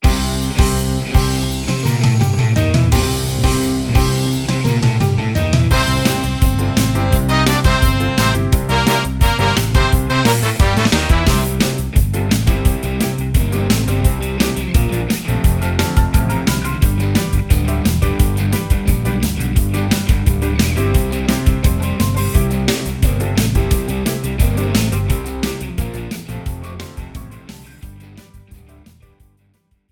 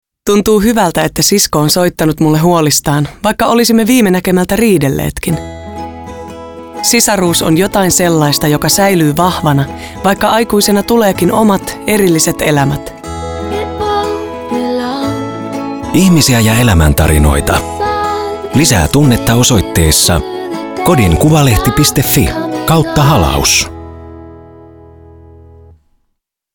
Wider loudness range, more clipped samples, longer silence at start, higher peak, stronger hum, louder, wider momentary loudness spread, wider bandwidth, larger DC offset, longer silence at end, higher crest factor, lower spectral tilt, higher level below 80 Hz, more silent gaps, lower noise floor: about the same, 6 LU vs 4 LU; neither; second, 0 s vs 0.25 s; about the same, 0 dBFS vs 0 dBFS; neither; second, -16 LUFS vs -10 LUFS; second, 5 LU vs 12 LU; about the same, 18.5 kHz vs over 20 kHz; neither; second, 1.35 s vs 1.9 s; about the same, 14 dB vs 12 dB; about the same, -5.5 dB/octave vs -4.5 dB/octave; about the same, -20 dBFS vs -24 dBFS; neither; second, -59 dBFS vs -67 dBFS